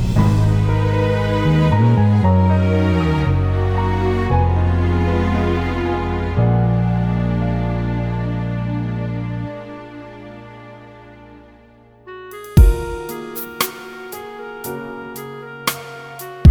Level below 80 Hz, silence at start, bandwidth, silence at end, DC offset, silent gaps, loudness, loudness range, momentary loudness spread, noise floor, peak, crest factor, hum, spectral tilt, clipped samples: -26 dBFS; 0 s; over 20 kHz; 0 s; under 0.1%; none; -18 LUFS; 11 LU; 19 LU; -47 dBFS; 0 dBFS; 18 dB; none; -7 dB/octave; under 0.1%